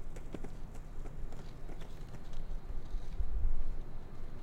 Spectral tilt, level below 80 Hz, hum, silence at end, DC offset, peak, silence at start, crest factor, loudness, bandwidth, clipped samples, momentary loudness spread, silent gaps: -7 dB/octave; -36 dBFS; none; 0 s; under 0.1%; -20 dBFS; 0 s; 14 dB; -46 LUFS; 4.2 kHz; under 0.1%; 10 LU; none